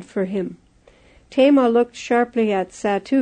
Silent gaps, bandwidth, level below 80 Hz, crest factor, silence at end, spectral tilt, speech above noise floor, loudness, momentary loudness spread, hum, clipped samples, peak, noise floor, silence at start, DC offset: none; 9.4 kHz; -58 dBFS; 16 dB; 0 s; -6 dB/octave; 34 dB; -19 LUFS; 11 LU; 60 Hz at -60 dBFS; under 0.1%; -4 dBFS; -52 dBFS; 0 s; under 0.1%